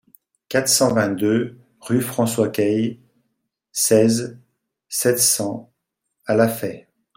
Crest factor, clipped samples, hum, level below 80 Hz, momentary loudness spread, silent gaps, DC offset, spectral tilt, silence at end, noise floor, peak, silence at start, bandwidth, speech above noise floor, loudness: 18 dB; under 0.1%; none; -62 dBFS; 14 LU; none; under 0.1%; -4 dB/octave; 0.35 s; -76 dBFS; -2 dBFS; 0.5 s; 16.5 kHz; 57 dB; -19 LUFS